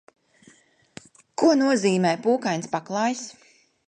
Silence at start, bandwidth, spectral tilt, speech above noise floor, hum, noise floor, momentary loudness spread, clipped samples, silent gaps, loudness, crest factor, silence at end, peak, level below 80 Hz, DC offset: 1.4 s; 10 kHz; -5 dB/octave; 35 dB; none; -57 dBFS; 13 LU; under 0.1%; none; -23 LUFS; 18 dB; 0.55 s; -8 dBFS; -72 dBFS; under 0.1%